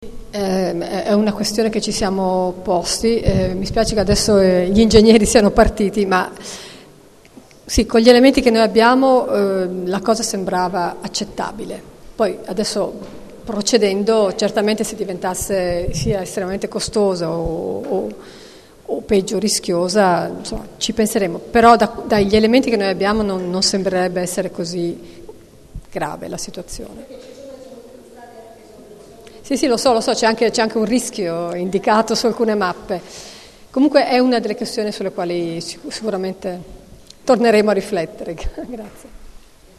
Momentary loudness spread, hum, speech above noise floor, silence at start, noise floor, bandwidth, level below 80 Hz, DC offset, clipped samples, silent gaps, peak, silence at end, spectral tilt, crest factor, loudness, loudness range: 17 LU; none; 29 dB; 0 s; -45 dBFS; 13 kHz; -36 dBFS; 0.1%; under 0.1%; none; 0 dBFS; 0.5 s; -4.5 dB/octave; 18 dB; -17 LUFS; 9 LU